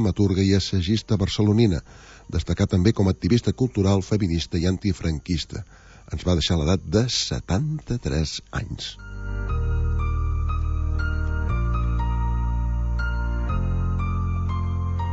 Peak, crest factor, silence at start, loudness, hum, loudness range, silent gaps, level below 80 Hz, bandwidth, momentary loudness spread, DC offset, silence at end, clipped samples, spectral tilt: -4 dBFS; 18 dB; 0 s; -24 LUFS; none; 5 LU; none; -28 dBFS; 8 kHz; 9 LU; under 0.1%; 0 s; under 0.1%; -6 dB/octave